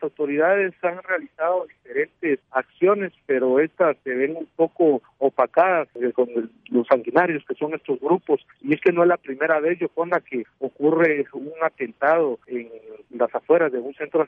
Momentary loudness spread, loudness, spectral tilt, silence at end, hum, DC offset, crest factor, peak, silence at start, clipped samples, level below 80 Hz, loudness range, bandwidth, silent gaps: 9 LU; -22 LUFS; -9 dB/octave; 0 s; none; under 0.1%; 18 dB; -4 dBFS; 0 s; under 0.1%; -74 dBFS; 2 LU; 4.7 kHz; none